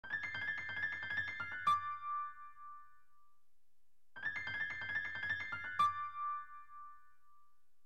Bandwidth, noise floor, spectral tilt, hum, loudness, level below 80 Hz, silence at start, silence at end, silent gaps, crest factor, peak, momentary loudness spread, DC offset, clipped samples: 13.5 kHz; -83 dBFS; -2.5 dB/octave; none; -39 LUFS; -78 dBFS; 0.05 s; 0.85 s; none; 18 dB; -24 dBFS; 20 LU; 0.2%; under 0.1%